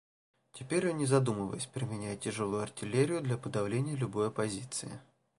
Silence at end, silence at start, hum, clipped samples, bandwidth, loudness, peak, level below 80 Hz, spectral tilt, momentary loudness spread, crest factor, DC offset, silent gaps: 0.4 s; 0.55 s; none; under 0.1%; 11.5 kHz; -34 LUFS; -14 dBFS; -66 dBFS; -5.5 dB/octave; 10 LU; 20 dB; under 0.1%; none